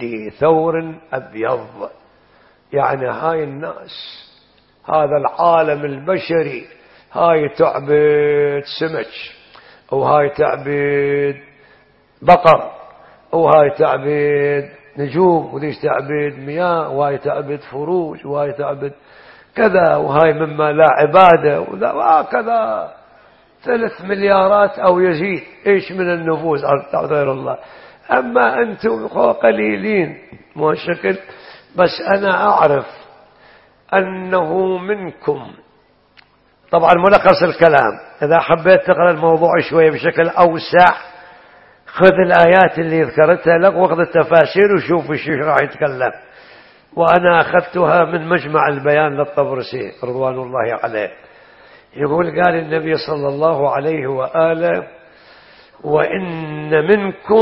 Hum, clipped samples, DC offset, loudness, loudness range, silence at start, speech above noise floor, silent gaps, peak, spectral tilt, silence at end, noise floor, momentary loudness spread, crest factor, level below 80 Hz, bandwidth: none; under 0.1%; under 0.1%; -15 LUFS; 7 LU; 0 s; 39 dB; none; 0 dBFS; -8.5 dB/octave; 0 s; -53 dBFS; 13 LU; 16 dB; -52 dBFS; 5.8 kHz